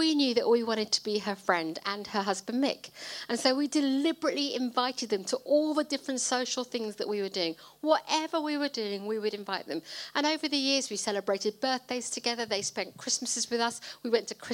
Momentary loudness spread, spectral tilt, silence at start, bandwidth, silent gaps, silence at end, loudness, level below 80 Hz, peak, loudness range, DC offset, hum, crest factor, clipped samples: 7 LU; -2.5 dB/octave; 0 s; 17 kHz; none; 0 s; -30 LUFS; -78 dBFS; -10 dBFS; 2 LU; under 0.1%; none; 20 dB; under 0.1%